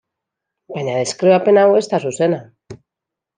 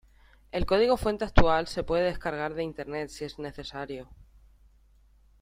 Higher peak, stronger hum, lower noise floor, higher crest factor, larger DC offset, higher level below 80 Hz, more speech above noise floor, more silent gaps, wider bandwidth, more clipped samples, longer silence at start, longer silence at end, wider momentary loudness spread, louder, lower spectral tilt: about the same, -2 dBFS vs -2 dBFS; neither; first, -84 dBFS vs -60 dBFS; second, 16 dB vs 26 dB; neither; second, -64 dBFS vs -38 dBFS; first, 69 dB vs 33 dB; neither; second, 9.8 kHz vs 15 kHz; neither; first, 0.7 s vs 0.55 s; second, 0.6 s vs 1.2 s; about the same, 14 LU vs 14 LU; first, -16 LUFS vs -29 LUFS; about the same, -5.5 dB/octave vs -6 dB/octave